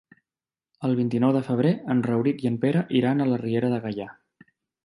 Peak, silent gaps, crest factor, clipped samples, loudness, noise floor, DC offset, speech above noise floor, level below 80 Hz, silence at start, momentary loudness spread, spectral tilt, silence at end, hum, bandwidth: -8 dBFS; none; 16 dB; under 0.1%; -24 LUFS; under -90 dBFS; under 0.1%; over 67 dB; -66 dBFS; 0.8 s; 8 LU; -9 dB/octave; 0.75 s; none; 10.5 kHz